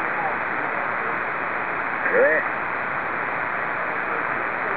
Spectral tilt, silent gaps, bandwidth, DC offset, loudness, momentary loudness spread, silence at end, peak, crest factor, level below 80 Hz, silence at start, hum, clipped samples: -8 dB/octave; none; 4 kHz; 0.6%; -23 LUFS; 6 LU; 0 s; -6 dBFS; 18 dB; -60 dBFS; 0 s; none; under 0.1%